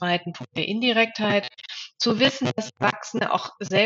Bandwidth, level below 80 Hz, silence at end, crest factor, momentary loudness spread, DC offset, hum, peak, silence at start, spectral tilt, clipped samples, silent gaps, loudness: 7.8 kHz; -74 dBFS; 0 s; 18 dB; 11 LU; under 0.1%; none; -6 dBFS; 0 s; -2.5 dB/octave; under 0.1%; none; -23 LUFS